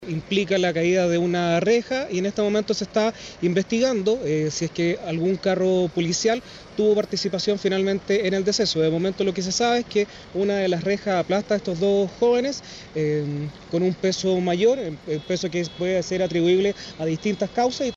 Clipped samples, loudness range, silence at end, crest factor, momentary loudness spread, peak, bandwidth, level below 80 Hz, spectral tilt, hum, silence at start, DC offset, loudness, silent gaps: under 0.1%; 1 LU; 0 s; 14 dB; 6 LU; -10 dBFS; 8 kHz; -54 dBFS; -5 dB/octave; none; 0 s; under 0.1%; -23 LUFS; none